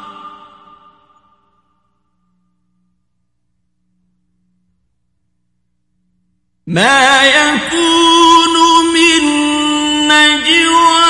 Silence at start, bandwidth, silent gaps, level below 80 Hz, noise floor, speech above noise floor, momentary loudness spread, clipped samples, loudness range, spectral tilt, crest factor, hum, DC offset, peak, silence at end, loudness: 0 s; 11.5 kHz; none; -50 dBFS; -68 dBFS; 59 dB; 6 LU; 0.1%; 7 LU; -2 dB/octave; 14 dB; none; under 0.1%; 0 dBFS; 0 s; -8 LUFS